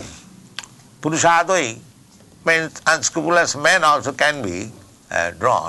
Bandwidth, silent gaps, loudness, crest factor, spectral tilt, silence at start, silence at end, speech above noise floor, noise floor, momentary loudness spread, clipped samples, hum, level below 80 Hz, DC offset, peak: 12.5 kHz; none; -18 LUFS; 16 dB; -2.5 dB/octave; 0 s; 0 s; 30 dB; -48 dBFS; 20 LU; under 0.1%; none; -52 dBFS; under 0.1%; -4 dBFS